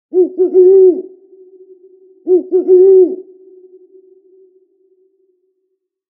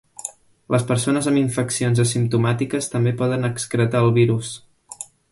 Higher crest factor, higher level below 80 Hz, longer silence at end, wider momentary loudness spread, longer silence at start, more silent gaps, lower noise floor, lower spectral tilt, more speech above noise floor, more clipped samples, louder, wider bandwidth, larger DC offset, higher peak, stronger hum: about the same, 14 dB vs 16 dB; second, -78 dBFS vs -54 dBFS; first, 2.95 s vs 0.25 s; about the same, 15 LU vs 15 LU; about the same, 0.15 s vs 0.2 s; neither; first, -69 dBFS vs -39 dBFS; first, -10 dB/octave vs -6 dB/octave; first, 61 dB vs 20 dB; neither; first, -10 LUFS vs -20 LUFS; second, 1.2 kHz vs 11.5 kHz; neither; first, 0 dBFS vs -4 dBFS; neither